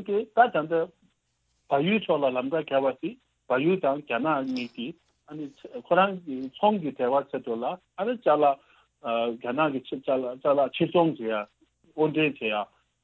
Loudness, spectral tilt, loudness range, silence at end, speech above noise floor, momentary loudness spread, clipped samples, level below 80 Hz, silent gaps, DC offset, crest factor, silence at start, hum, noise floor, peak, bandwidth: -26 LUFS; -8 dB/octave; 2 LU; 0.4 s; 48 dB; 14 LU; under 0.1%; -72 dBFS; none; under 0.1%; 20 dB; 0 s; none; -74 dBFS; -8 dBFS; 6.6 kHz